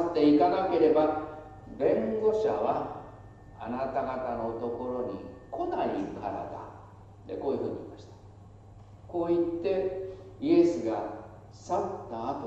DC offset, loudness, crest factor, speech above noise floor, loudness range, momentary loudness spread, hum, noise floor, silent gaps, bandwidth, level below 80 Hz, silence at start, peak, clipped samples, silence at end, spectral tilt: under 0.1%; -29 LUFS; 18 dB; 22 dB; 7 LU; 21 LU; none; -50 dBFS; none; 8 kHz; -58 dBFS; 0 s; -12 dBFS; under 0.1%; 0 s; -7.5 dB/octave